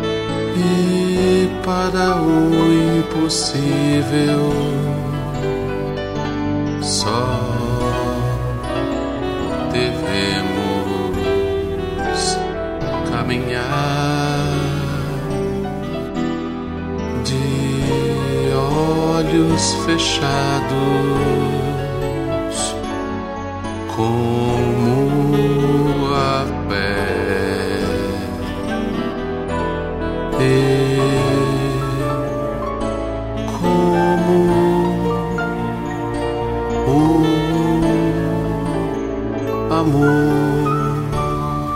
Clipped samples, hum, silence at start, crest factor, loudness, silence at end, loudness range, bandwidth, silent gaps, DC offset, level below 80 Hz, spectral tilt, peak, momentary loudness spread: under 0.1%; none; 0 s; 14 dB; -19 LUFS; 0 s; 4 LU; 16 kHz; none; under 0.1%; -34 dBFS; -6 dB/octave; -4 dBFS; 8 LU